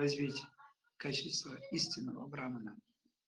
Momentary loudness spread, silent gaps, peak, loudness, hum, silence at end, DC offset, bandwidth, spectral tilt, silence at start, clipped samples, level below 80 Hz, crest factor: 13 LU; none; -24 dBFS; -40 LUFS; none; 0.5 s; under 0.1%; 11.5 kHz; -4 dB/octave; 0 s; under 0.1%; -78 dBFS; 18 dB